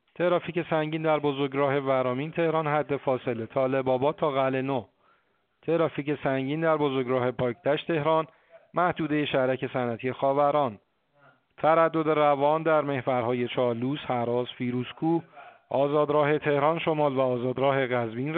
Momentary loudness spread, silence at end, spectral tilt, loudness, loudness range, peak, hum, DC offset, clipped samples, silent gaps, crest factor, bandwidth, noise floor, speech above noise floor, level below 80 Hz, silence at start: 6 LU; 0 s; -5 dB/octave; -26 LUFS; 3 LU; -8 dBFS; none; under 0.1%; under 0.1%; none; 18 dB; 4.4 kHz; -69 dBFS; 44 dB; -68 dBFS; 0.2 s